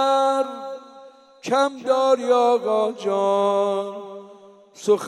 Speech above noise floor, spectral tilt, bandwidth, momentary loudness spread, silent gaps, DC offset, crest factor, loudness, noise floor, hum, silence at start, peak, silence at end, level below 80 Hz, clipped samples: 27 dB; -4.5 dB/octave; 12.5 kHz; 18 LU; none; under 0.1%; 16 dB; -21 LUFS; -47 dBFS; none; 0 s; -6 dBFS; 0 s; -84 dBFS; under 0.1%